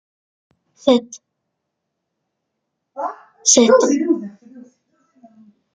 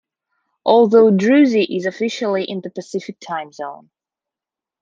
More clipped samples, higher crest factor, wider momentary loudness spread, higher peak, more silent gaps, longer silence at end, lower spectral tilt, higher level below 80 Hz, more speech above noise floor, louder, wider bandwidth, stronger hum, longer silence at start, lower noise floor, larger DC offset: neither; about the same, 20 dB vs 16 dB; about the same, 18 LU vs 16 LU; about the same, -2 dBFS vs -2 dBFS; neither; about the same, 1.15 s vs 1.05 s; second, -2 dB/octave vs -6 dB/octave; about the same, -68 dBFS vs -70 dBFS; second, 63 dB vs 72 dB; about the same, -16 LUFS vs -16 LUFS; first, 10 kHz vs 7.6 kHz; neither; first, 0.85 s vs 0.65 s; second, -77 dBFS vs -88 dBFS; neither